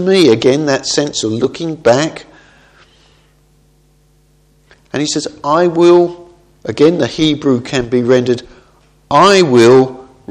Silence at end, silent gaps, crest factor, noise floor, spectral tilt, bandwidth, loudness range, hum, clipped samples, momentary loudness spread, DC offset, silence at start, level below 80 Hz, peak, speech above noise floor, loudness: 0.3 s; none; 14 dB; -51 dBFS; -5 dB/octave; 11 kHz; 10 LU; none; 0.2%; 12 LU; under 0.1%; 0 s; -48 dBFS; 0 dBFS; 40 dB; -12 LUFS